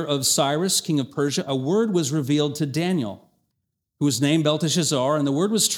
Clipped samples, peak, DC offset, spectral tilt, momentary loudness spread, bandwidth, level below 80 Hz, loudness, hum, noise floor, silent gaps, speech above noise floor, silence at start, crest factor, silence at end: under 0.1%; -6 dBFS; under 0.1%; -4 dB/octave; 5 LU; 19 kHz; -68 dBFS; -22 LUFS; none; -78 dBFS; none; 56 dB; 0 s; 16 dB; 0 s